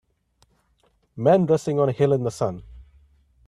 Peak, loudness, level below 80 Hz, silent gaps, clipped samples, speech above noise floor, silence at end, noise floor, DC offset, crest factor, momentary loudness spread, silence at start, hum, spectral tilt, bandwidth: -4 dBFS; -21 LUFS; -54 dBFS; none; under 0.1%; 45 dB; 0.65 s; -65 dBFS; under 0.1%; 20 dB; 10 LU; 1.15 s; none; -7.5 dB/octave; 13 kHz